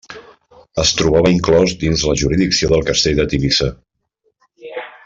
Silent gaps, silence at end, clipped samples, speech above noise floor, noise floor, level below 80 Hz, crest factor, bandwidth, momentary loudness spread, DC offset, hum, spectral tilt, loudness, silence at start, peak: none; 0.15 s; under 0.1%; 52 dB; -66 dBFS; -32 dBFS; 14 dB; 7.8 kHz; 12 LU; under 0.1%; none; -4.5 dB/octave; -15 LUFS; 0.1 s; -2 dBFS